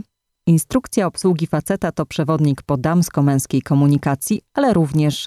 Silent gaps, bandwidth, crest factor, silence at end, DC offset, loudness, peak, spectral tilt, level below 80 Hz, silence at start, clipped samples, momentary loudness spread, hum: none; 14 kHz; 14 dB; 0 s; under 0.1%; -18 LUFS; -2 dBFS; -6.5 dB/octave; -48 dBFS; 0.45 s; under 0.1%; 5 LU; none